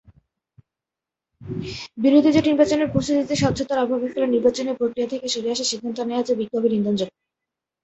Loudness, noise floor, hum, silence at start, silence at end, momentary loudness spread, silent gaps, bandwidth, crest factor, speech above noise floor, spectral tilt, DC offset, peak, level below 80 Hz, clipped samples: -21 LUFS; -88 dBFS; none; 1.4 s; 0.75 s; 10 LU; none; 8.2 kHz; 18 dB; 67 dB; -5 dB/octave; under 0.1%; -4 dBFS; -52 dBFS; under 0.1%